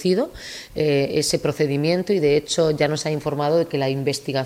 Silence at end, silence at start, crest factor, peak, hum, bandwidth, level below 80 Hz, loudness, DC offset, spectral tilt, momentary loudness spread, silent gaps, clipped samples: 0 s; 0 s; 16 dB; -6 dBFS; none; 16 kHz; -52 dBFS; -21 LUFS; under 0.1%; -5 dB/octave; 5 LU; none; under 0.1%